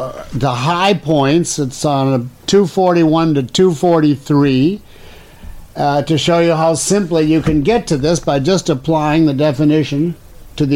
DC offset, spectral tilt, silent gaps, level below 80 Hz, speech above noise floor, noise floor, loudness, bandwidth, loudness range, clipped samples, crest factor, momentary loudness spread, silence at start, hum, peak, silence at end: under 0.1%; -5.5 dB/octave; none; -38 dBFS; 24 dB; -37 dBFS; -14 LUFS; 16 kHz; 2 LU; under 0.1%; 12 dB; 7 LU; 0 s; none; -2 dBFS; 0 s